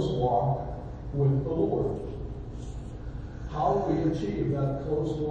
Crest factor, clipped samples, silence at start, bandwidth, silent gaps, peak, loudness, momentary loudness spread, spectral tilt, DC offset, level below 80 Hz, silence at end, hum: 16 dB; under 0.1%; 0 s; 7.8 kHz; none; -12 dBFS; -29 LUFS; 14 LU; -9 dB/octave; under 0.1%; -40 dBFS; 0 s; none